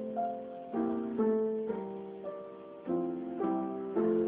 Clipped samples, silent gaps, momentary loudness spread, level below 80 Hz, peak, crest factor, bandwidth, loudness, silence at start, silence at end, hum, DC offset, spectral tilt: under 0.1%; none; 12 LU; -72 dBFS; -20 dBFS; 14 dB; 3.8 kHz; -35 LUFS; 0 s; 0 s; none; under 0.1%; -8.5 dB/octave